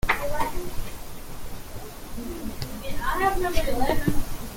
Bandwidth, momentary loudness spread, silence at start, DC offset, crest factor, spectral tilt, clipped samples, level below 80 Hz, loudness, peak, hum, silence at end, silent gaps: 17 kHz; 16 LU; 0.05 s; under 0.1%; 18 dB; -4.5 dB/octave; under 0.1%; -32 dBFS; -28 LUFS; -6 dBFS; none; 0 s; none